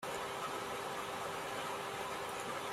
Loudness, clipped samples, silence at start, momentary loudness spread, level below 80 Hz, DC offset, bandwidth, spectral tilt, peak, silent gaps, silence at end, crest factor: -41 LUFS; under 0.1%; 0 s; 1 LU; -70 dBFS; under 0.1%; 16 kHz; -2.5 dB/octave; -28 dBFS; none; 0 s; 14 dB